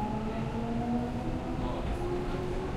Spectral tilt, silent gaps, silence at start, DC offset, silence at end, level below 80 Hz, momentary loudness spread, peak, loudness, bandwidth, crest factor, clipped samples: -7.5 dB/octave; none; 0 s; under 0.1%; 0 s; -40 dBFS; 3 LU; -20 dBFS; -34 LUFS; 13 kHz; 12 dB; under 0.1%